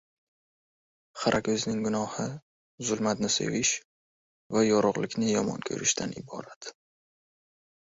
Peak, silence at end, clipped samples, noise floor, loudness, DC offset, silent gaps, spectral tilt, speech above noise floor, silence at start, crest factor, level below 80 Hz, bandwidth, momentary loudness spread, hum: -10 dBFS; 1.25 s; under 0.1%; under -90 dBFS; -28 LUFS; under 0.1%; 2.42-2.78 s, 3.85-4.50 s, 6.56-6.61 s; -3.5 dB/octave; over 62 dB; 1.15 s; 20 dB; -64 dBFS; 8 kHz; 16 LU; none